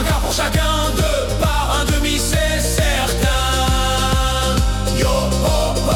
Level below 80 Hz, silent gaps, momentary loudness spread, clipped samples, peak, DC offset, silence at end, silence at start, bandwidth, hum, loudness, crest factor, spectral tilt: -20 dBFS; none; 2 LU; under 0.1%; -4 dBFS; under 0.1%; 0 s; 0 s; 18 kHz; none; -17 LUFS; 12 dB; -4 dB/octave